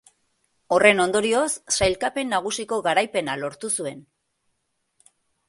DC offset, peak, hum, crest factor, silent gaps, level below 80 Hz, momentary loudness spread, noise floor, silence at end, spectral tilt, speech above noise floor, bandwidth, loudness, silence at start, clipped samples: under 0.1%; 0 dBFS; none; 24 dB; none; -52 dBFS; 10 LU; -74 dBFS; 1.5 s; -2.5 dB/octave; 52 dB; 12 kHz; -22 LUFS; 0.7 s; under 0.1%